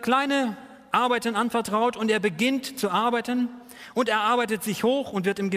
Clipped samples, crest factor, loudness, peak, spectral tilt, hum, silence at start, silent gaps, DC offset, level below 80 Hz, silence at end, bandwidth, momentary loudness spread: under 0.1%; 20 dB; -25 LUFS; -6 dBFS; -4.5 dB/octave; none; 0 s; none; under 0.1%; -66 dBFS; 0 s; 15.5 kHz; 6 LU